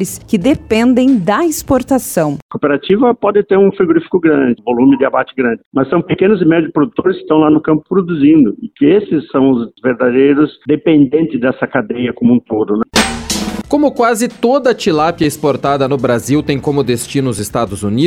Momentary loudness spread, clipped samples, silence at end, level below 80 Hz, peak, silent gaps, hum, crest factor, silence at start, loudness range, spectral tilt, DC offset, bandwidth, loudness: 6 LU; under 0.1%; 0 s; -42 dBFS; 0 dBFS; 2.42-2.49 s, 5.66-5.71 s; none; 12 dB; 0 s; 2 LU; -5.5 dB/octave; under 0.1%; 17.5 kHz; -13 LUFS